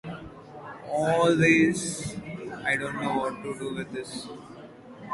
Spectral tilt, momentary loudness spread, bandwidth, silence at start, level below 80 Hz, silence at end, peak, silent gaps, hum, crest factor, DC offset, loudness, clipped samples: -5 dB/octave; 24 LU; 11.5 kHz; 0.05 s; -58 dBFS; 0 s; -8 dBFS; none; none; 20 dB; under 0.1%; -26 LUFS; under 0.1%